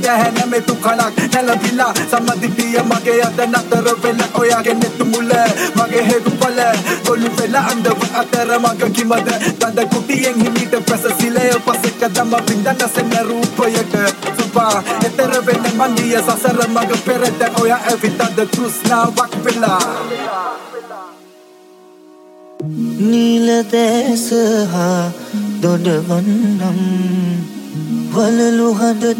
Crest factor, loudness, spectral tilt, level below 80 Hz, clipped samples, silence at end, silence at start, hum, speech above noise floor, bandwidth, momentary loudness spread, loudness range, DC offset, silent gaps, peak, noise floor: 14 dB; -15 LUFS; -4.5 dB/octave; -60 dBFS; under 0.1%; 0 s; 0 s; none; 28 dB; 17 kHz; 5 LU; 3 LU; under 0.1%; none; 0 dBFS; -42 dBFS